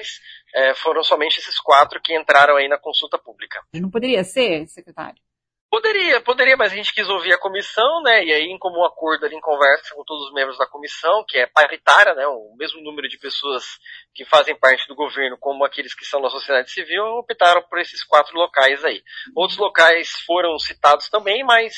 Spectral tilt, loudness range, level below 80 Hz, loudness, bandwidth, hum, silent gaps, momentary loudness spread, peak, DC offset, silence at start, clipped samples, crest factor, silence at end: -2.5 dB/octave; 4 LU; -66 dBFS; -17 LUFS; 11 kHz; none; 5.61-5.69 s; 15 LU; 0 dBFS; under 0.1%; 0 s; under 0.1%; 18 dB; 0 s